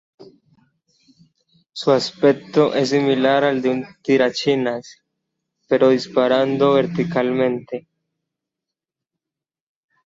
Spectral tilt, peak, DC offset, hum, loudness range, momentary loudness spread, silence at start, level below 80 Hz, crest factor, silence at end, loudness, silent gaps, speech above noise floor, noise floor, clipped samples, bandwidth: -6 dB/octave; -2 dBFS; under 0.1%; none; 3 LU; 9 LU; 0.2 s; -62 dBFS; 18 dB; 2.25 s; -18 LUFS; none; 70 dB; -88 dBFS; under 0.1%; 8 kHz